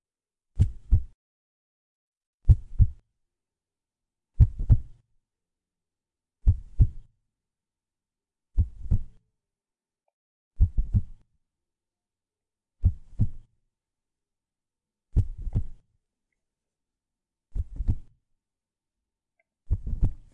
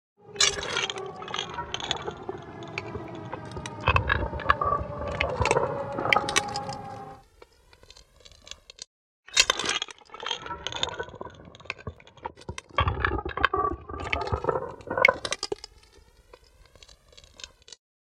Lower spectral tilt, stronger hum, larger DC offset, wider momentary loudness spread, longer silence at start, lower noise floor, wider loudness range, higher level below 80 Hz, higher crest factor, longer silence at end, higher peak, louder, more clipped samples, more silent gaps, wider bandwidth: first, -10.5 dB/octave vs -2.5 dB/octave; neither; neither; second, 11 LU vs 21 LU; first, 0.55 s vs 0.25 s; first, under -90 dBFS vs -56 dBFS; first, 9 LU vs 6 LU; first, -32 dBFS vs -44 dBFS; second, 24 dB vs 30 dB; second, 0.2 s vs 0.35 s; second, -4 dBFS vs 0 dBFS; about the same, -28 LUFS vs -28 LUFS; neither; first, 1.14-2.38 s, 10.13-10.51 s vs 8.87-9.23 s; second, 1.6 kHz vs 16.5 kHz